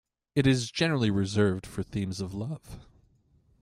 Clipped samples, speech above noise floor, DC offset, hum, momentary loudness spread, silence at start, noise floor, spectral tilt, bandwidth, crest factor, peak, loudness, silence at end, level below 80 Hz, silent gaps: under 0.1%; 37 dB; under 0.1%; none; 14 LU; 0.35 s; -65 dBFS; -6 dB/octave; 13.5 kHz; 18 dB; -10 dBFS; -28 LUFS; 0.8 s; -54 dBFS; none